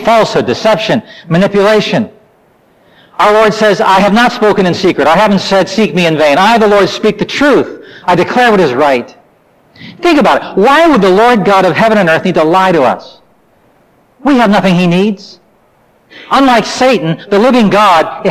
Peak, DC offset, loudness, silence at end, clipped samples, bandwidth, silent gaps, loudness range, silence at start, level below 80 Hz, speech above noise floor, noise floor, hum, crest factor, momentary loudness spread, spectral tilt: -2 dBFS; under 0.1%; -8 LUFS; 0 s; under 0.1%; 15.5 kHz; none; 3 LU; 0 s; -44 dBFS; 41 dB; -49 dBFS; none; 8 dB; 7 LU; -5.5 dB/octave